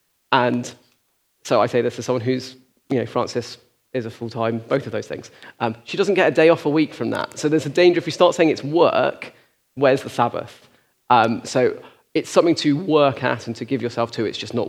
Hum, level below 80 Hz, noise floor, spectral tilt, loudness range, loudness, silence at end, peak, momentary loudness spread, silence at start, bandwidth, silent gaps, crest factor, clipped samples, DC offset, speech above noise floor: none; -70 dBFS; -66 dBFS; -5.5 dB/octave; 7 LU; -20 LUFS; 0 s; 0 dBFS; 14 LU; 0.3 s; 14 kHz; none; 20 dB; under 0.1%; under 0.1%; 47 dB